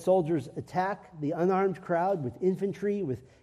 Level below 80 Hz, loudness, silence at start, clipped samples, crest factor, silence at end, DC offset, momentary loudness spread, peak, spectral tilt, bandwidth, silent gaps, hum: -66 dBFS; -30 LUFS; 0 s; under 0.1%; 16 dB; 0.2 s; under 0.1%; 8 LU; -14 dBFS; -8 dB/octave; 12 kHz; none; none